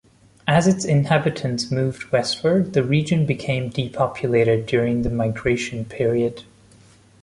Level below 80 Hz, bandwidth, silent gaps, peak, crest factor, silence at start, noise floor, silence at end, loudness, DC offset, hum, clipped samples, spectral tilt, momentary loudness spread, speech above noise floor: -46 dBFS; 11.5 kHz; none; -4 dBFS; 18 dB; 0.45 s; -51 dBFS; 0.8 s; -21 LUFS; under 0.1%; none; under 0.1%; -6 dB/octave; 6 LU; 31 dB